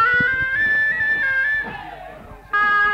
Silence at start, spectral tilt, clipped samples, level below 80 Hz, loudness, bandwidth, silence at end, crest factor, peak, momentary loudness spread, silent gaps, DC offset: 0 s; -4.5 dB/octave; under 0.1%; -46 dBFS; -18 LUFS; 15 kHz; 0 s; 12 dB; -8 dBFS; 19 LU; none; under 0.1%